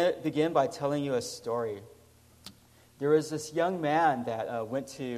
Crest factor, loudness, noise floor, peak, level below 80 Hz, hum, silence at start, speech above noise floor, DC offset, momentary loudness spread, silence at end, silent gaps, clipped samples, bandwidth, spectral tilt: 18 dB; -30 LUFS; -59 dBFS; -12 dBFS; -70 dBFS; 60 Hz at -60 dBFS; 0 s; 29 dB; under 0.1%; 16 LU; 0 s; none; under 0.1%; 15 kHz; -5.5 dB/octave